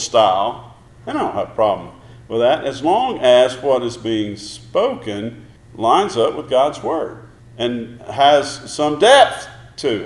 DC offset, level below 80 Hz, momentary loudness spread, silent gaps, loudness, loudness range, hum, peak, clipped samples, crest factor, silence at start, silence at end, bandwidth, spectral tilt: under 0.1%; -52 dBFS; 15 LU; none; -17 LUFS; 3 LU; none; 0 dBFS; under 0.1%; 18 dB; 0 s; 0 s; 11.5 kHz; -4 dB/octave